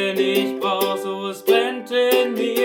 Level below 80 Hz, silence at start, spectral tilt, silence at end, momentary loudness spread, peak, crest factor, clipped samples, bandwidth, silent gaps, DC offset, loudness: -80 dBFS; 0 s; -3.5 dB/octave; 0 s; 6 LU; -4 dBFS; 16 dB; under 0.1%; 20 kHz; none; under 0.1%; -20 LUFS